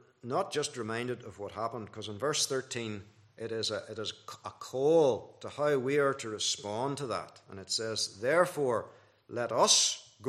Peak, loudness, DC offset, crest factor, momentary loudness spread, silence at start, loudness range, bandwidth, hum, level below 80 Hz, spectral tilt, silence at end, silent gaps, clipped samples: -12 dBFS; -31 LUFS; under 0.1%; 22 dB; 17 LU; 0.25 s; 6 LU; 14.5 kHz; none; -78 dBFS; -2.5 dB/octave; 0 s; none; under 0.1%